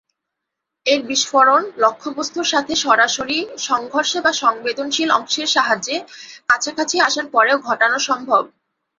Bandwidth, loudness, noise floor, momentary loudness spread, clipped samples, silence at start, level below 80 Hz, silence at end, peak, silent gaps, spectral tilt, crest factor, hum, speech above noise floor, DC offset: 8 kHz; -17 LUFS; -81 dBFS; 9 LU; under 0.1%; 0.85 s; -64 dBFS; 0.55 s; -2 dBFS; none; -0.5 dB/octave; 18 dB; none; 63 dB; under 0.1%